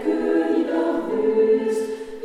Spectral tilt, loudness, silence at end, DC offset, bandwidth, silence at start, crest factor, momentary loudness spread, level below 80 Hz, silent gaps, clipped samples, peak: -6 dB/octave; -21 LUFS; 0 s; under 0.1%; 11.5 kHz; 0 s; 12 dB; 6 LU; -56 dBFS; none; under 0.1%; -10 dBFS